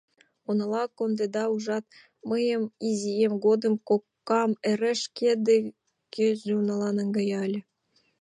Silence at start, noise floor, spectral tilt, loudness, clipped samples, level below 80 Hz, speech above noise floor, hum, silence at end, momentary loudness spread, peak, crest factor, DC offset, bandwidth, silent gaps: 0.5 s; -70 dBFS; -5.5 dB/octave; -27 LUFS; under 0.1%; -80 dBFS; 44 dB; none; 0.6 s; 8 LU; -12 dBFS; 16 dB; under 0.1%; 10.5 kHz; none